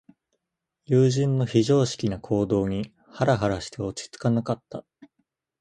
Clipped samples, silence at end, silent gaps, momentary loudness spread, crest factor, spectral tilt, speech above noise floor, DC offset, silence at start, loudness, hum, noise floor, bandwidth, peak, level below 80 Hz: under 0.1%; 0.55 s; none; 12 LU; 18 dB; -6.5 dB/octave; 59 dB; under 0.1%; 0.9 s; -24 LUFS; none; -82 dBFS; 9.4 kHz; -8 dBFS; -52 dBFS